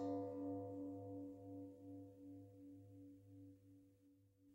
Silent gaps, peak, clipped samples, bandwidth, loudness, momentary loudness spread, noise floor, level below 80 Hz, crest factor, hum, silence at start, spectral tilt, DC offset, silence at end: none; -36 dBFS; under 0.1%; 16 kHz; -53 LUFS; 16 LU; -73 dBFS; -86 dBFS; 16 dB; none; 0 s; -9.5 dB/octave; under 0.1%; 0 s